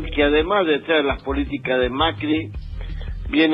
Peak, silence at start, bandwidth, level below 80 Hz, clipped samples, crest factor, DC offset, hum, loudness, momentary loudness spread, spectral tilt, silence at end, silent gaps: -6 dBFS; 0 s; 5.4 kHz; -32 dBFS; under 0.1%; 14 dB; under 0.1%; none; -20 LUFS; 14 LU; -8 dB/octave; 0 s; none